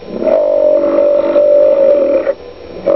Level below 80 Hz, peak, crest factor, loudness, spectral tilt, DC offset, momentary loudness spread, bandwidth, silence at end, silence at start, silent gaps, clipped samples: -46 dBFS; 0 dBFS; 10 dB; -11 LUFS; -8.5 dB/octave; 0.6%; 11 LU; 5.4 kHz; 0 s; 0 s; none; under 0.1%